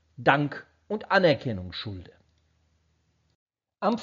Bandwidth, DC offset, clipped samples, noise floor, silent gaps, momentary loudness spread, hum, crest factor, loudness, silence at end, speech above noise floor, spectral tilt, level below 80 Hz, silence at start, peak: 7.4 kHz; under 0.1%; under 0.1%; -70 dBFS; 3.35-3.46 s; 17 LU; none; 24 dB; -26 LUFS; 0 s; 44 dB; -4 dB/octave; -62 dBFS; 0.2 s; -4 dBFS